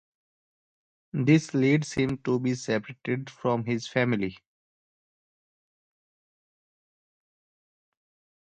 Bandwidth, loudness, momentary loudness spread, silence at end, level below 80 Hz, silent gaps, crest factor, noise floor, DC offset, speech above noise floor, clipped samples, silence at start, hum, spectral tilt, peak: 9 kHz; -27 LUFS; 10 LU; 4.1 s; -64 dBFS; none; 22 dB; under -90 dBFS; under 0.1%; over 64 dB; under 0.1%; 1.15 s; none; -6.5 dB/octave; -8 dBFS